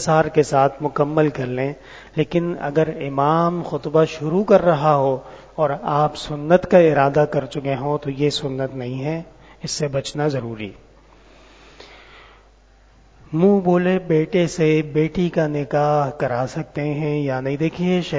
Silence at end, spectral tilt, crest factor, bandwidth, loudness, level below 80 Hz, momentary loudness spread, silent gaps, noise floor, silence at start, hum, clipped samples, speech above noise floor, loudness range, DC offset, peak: 0 s; -6.5 dB/octave; 20 dB; 8 kHz; -20 LUFS; -50 dBFS; 11 LU; none; -51 dBFS; 0 s; none; under 0.1%; 32 dB; 9 LU; under 0.1%; 0 dBFS